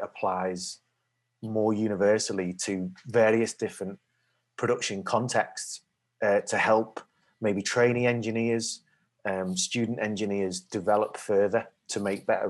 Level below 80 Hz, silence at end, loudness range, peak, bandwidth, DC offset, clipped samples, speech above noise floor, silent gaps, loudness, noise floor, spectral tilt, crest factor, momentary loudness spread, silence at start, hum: -76 dBFS; 0 s; 2 LU; -10 dBFS; 12.5 kHz; under 0.1%; under 0.1%; 51 dB; none; -28 LUFS; -78 dBFS; -4.5 dB/octave; 18 dB; 13 LU; 0 s; none